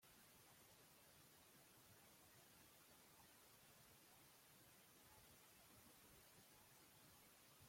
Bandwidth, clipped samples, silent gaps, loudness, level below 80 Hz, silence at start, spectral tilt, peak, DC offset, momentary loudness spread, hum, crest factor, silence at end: 16.5 kHz; under 0.1%; none; -68 LUFS; -88 dBFS; 0 s; -2.5 dB/octave; -56 dBFS; under 0.1%; 1 LU; none; 14 dB; 0 s